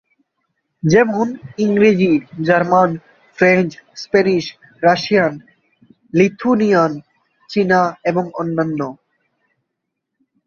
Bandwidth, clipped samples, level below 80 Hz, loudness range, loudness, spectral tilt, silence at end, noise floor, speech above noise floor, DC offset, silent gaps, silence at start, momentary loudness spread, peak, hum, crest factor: 7.2 kHz; under 0.1%; -58 dBFS; 4 LU; -16 LUFS; -6.5 dB/octave; 1.5 s; -77 dBFS; 62 dB; under 0.1%; none; 0.85 s; 10 LU; 0 dBFS; none; 16 dB